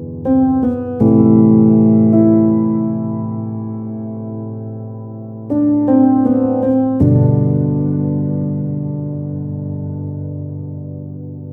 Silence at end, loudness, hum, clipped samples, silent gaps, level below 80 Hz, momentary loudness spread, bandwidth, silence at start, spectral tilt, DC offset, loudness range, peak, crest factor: 0 s; -15 LUFS; none; under 0.1%; none; -42 dBFS; 17 LU; 2.1 kHz; 0 s; -14 dB/octave; under 0.1%; 9 LU; 0 dBFS; 14 dB